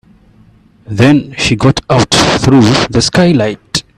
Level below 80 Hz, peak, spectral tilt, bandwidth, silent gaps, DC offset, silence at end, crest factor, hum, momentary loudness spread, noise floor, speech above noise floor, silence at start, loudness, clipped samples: -34 dBFS; 0 dBFS; -5 dB/octave; 13.5 kHz; none; under 0.1%; 0.15 s; 10 dB; none; 6 LU; -44 dBFS; 35 dB; 0.9 s; -9 LUFS; under 0.1%